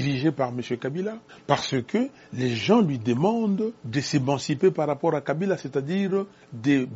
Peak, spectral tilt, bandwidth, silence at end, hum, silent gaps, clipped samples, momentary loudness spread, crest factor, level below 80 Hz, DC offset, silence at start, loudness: -4 dBFS; -5.5 dB/octave; 8 kHz; 0 s; none; none; under 0.1%; 8 LU; 20 dB; -64 dBFS; under 0.1%; 0 s; -25 LUFS